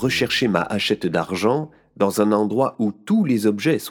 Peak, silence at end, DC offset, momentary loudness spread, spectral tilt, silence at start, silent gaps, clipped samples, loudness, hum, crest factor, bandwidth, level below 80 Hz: -2 dBFS; 0 s; under 0.1%; 4 LU; -5.5 dB/octave; 0 s; none; under 0.1%; -20 LUFS; none; 18 dB; 19 kHz; -56 dBFS